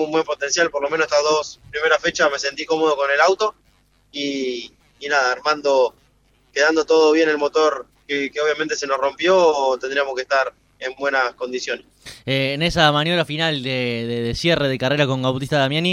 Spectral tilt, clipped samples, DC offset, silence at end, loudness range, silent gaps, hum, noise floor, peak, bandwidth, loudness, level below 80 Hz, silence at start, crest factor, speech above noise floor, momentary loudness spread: -4 dB/octave; under 0.1%; under 0.1%; 0 s; 3 LU; none; 50 Hz at -60 dBFS; -59 dBFS; -2 dBFS; 12.5 kHz; -19 LUFS; -50 dBFS; 0 s; 18 dB; 39 dB; 11 LU